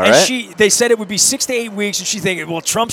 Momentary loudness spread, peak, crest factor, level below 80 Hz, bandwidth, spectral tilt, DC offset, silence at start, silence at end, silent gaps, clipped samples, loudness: 7 LU; 0 dBFS; 16 dB; -54 dBFS; 17.5 kHz; -2 dB/octave; under 0.1%; 0 s; 0 s; none; under 0.1%; -14 LUFS